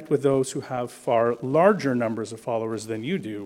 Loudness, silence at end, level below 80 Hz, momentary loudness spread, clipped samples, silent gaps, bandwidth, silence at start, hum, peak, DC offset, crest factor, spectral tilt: -24 LUFS; 0 s; -66 dBFS; 10 LU; under 0.1%; none; 15.5 kHz; 0 s; none; -4 dBFS; under 0.1%; 20 dB; -6 dB/octave